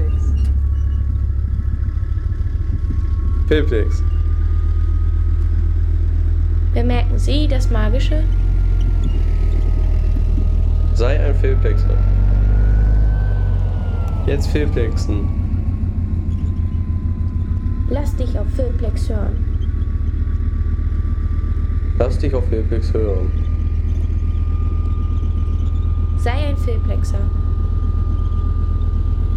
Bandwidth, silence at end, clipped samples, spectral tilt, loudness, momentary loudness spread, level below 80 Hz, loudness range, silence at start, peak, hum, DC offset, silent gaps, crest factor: 7.6 kHz; 0 s; under 0.1%; -8 dB/octave; -19 LUFS; 4 LU; -18 dBFS; 3 LU; 0 s; -2 dBFS; none; under 0.1%; none; 14 dB